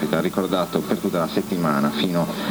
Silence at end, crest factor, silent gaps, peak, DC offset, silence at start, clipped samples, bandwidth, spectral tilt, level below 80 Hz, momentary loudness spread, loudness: 0 s; 18 dB; none; -4 dBFS; under 0.1%; 0 s; under 0.1%; over 20 kHz; -6 dB/octave; -54 dBFS; 2 LU; -22 LUFS